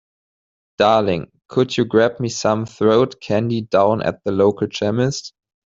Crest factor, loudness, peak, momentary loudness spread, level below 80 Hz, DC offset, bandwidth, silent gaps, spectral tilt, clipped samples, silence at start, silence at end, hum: 16 dB; -18 LUFS; -2 dBFS; 6 LU; -56 dBFS; under 0.1%; 7.8 kHz; none; -5.5 dB/octave; under 0.1%; 0.8 s; 0.5 s; none